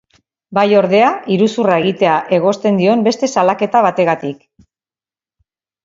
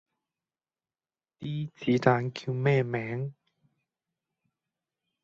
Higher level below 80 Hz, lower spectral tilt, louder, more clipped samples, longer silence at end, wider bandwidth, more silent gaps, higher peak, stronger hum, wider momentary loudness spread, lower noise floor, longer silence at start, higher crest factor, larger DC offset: first, -60 dBFS vs -68 dBFS; second, -6 dB/octave vs -7.5 dB/octave; first, -14 LUFS vs -29 LUFS; neither; second, 1.5 s vs 1.9 s; about the same, 7.8 kHz vs 7.6 kHz; neither; first, 0 dBFS vs -6 dBFS; neither; second, 4 LU vs 12 LU; about the same, under -90 dBFS vs under -90 dBFS; second, 0.5 s vs 1.4 s; second, 14 dB vs 26 dB; neither